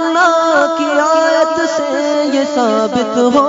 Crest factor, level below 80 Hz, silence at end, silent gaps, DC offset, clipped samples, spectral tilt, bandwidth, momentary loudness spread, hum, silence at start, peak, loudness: 12 dB; -58 dBFS; 0 s; none; under 0.1%; under 0.1%; -3.5 dB/octave; 7.8 kHz; 4 LU; none; 0 s; 0 dBFS; -13 LUFS